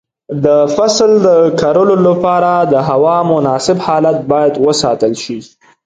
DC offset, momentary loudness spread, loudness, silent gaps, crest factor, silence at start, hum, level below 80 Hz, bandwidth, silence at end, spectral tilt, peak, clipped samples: under 0.1%; 6 LU; -11 LUFS; none; 10 dB; 0.3 s; none; -50 dBFS; 9.4 kHz; 0.4 s; -5.5 dB/octave; 0 dBFS; under 0.1%